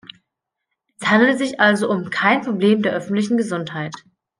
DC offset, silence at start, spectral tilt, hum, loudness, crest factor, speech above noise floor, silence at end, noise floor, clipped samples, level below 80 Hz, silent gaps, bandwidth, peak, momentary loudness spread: under 0.1%; 1 s; -5.5 dB/octave; none; -18 LUFS; 18 dB; 62 dB; 0.4 s; -80 dBFS; under 0.1%; -64 dBFS; none; 10.5 kHz; 0 dBFS; 10 LU